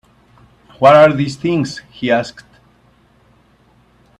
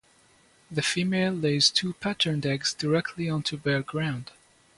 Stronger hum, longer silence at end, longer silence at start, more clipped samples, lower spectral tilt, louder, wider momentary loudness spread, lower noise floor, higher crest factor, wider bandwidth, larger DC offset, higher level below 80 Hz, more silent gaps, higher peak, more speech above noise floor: neither; first, 1.9 s vs 0.55 s; about the same, 0.8 s vs 0.7 s; neither; first, -6.5 dB/octave vs -4 dB/octave; first, -13 LUFS vs -26 LUFS; first, 16 LU vs 9 LU; second, -52 dBFS vs -60 dBFS; second, 16 dB vs 22 dB; about the same, 10.5 kHz vs 11.5 kHz; neither; first, -54 dBFS vs -62 dBFS; neither; first, 0 dBFS vs -6 dBFS; first, 39 dB vs 34 dB